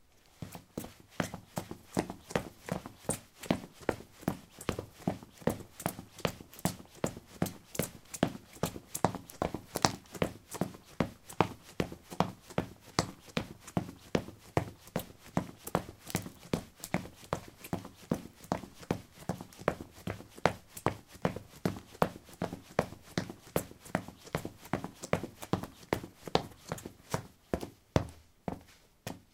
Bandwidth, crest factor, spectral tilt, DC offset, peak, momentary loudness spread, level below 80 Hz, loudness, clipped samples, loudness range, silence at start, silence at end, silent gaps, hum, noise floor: 17.5 kHz; 36 dB; -5 dB/octave; under 0.1%; -2 dBFS; 8 LU; -58 dBFS; -38 LUFS; under 0.1%; 4 LU; 0.4 s; 0.15 s; none; none; -58 dBFS